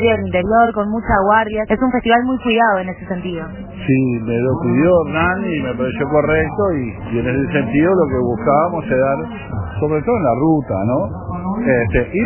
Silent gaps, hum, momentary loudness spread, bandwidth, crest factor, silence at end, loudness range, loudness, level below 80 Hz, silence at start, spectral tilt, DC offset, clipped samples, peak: none; none; 10 LU; 3.2 kHz; 16 dB; 0 s; 2 LU; -16 LUFS; -34 dBFS; 0 s; -11 dB/octave; under 0.1%; under 0.1%; 0 dBFS